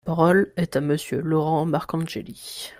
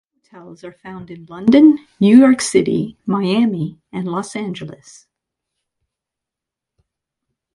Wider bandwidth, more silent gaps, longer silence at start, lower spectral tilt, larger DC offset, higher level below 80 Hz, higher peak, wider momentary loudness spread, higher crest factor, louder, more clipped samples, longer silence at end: first, 16 kHz vs 11.5 kHz; neither; second, 0.05 s vs 0.35 s; about the same, -6.5 dB/octave vs -6 dB/octave; neither; about the same, -56 dBFS vs -58 dBFS; second, -6 dBFS vs 0 dBFS; second, 14 LU vs 24 LU; about the same, 18 dB vs 18 dB; second, -23 LUFS vs -15 LUFS; neither; second, 0.05 s vs 2.85 s